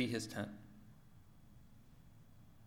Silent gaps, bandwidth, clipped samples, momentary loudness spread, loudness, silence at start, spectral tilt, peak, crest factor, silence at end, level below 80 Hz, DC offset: none; 19 kHz; under 0.1%; 23 LU; -44 LUFS; 0 s; -5 dB/octave; -24 dBFS; 24 dB; 0 s; -68 dBFS; under 0.1%